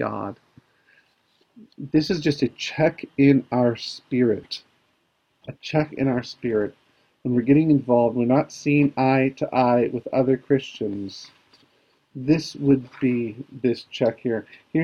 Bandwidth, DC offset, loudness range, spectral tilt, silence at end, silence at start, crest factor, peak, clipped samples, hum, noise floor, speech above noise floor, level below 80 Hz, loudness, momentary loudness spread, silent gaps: 7.4 kHz; under 0.1%; 6 LU; -7 dB/octave; 0 s; 0 s; 18 dB; -4 dBFS; under 0.1%; none; -68 dBFS; 47 dB; -58 dBFS; -22 LUFS; 14 LU; none